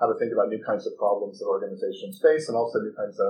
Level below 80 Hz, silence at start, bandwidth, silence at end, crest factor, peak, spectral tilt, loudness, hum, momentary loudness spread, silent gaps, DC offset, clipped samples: -82 dBFS; 0 s; 16 kHz; 0 s; 18 dB; -6 dBFS; -5.5 dB/octave; -26 LUFS; none; 9 LU; none; under 0.1%; under 0.1%